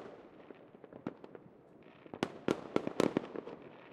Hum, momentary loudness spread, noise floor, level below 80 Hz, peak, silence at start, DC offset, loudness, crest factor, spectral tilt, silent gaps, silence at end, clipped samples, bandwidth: none; 23 LU; -59 dBFS; -74 dBFS; -12 dBFS; 0 s; under 0.1%; -38 LUFS; 30 dB; -6 dB/octave; none; 0 s; under 0.1%; 14.5 kHz